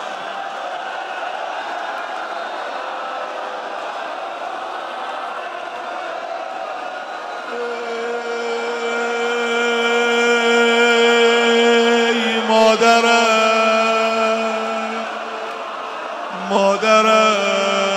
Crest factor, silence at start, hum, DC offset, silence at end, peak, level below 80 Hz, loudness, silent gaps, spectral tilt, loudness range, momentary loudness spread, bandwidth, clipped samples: 18 dB; 0 s; none; under 0.1%; 0 s; -2 dBFS; -70 dBFS; -18 LUFS; none; -2.5 dB/octave; 13 LU; 14 LU; 13.5 kHz; under 0.1%